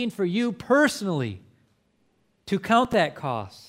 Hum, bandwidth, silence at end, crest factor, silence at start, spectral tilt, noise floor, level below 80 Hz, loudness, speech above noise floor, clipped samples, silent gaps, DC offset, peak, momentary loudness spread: none; 16 kHz; 0.1 s; 18 dB; 0 s; -5.5 dB/octave; -67 dBFS; -60 dBFS; -24 LUFS; 43 dB; under 0.1%; none; under 0.1%; -6 dBFS; 10 LU